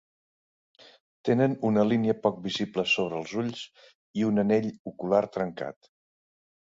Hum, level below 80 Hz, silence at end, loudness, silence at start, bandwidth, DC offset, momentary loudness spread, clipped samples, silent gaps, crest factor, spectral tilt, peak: none; -66 dBFS; 0.95 s; -27 LUFS; 1.25 s; 7.8 kHz; under 0.1%; 13 LU; under 0.1%; 3.95-4.14 s, 4.79-4.85 s; 20 dB; -6.5 dB/octave; -8 dBFS